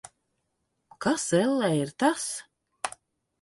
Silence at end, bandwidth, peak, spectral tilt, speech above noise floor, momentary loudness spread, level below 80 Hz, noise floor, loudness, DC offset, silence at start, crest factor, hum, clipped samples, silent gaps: 0.5 s; 12 kHz; -10 dBFS; -4.5 dB/octave; 52 dB; 12 LU; -70 dBFS; -78 dBFS; -27 LUFS; under 0.1%; 1 s; 20 dB; none; under 0.1%; none